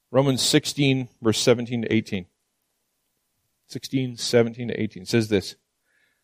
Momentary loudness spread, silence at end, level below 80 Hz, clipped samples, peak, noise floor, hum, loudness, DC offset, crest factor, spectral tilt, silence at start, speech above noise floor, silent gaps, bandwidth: 12 LU; 0.7 s; -62 dBFS; under 0.1%; -4 dBFS; -75 dBFS; none; -23 LUFS; under 0.1%; 20 dB; -4.5 dB/octave; 0.1 s; 52 dB; none; 15.5 kHz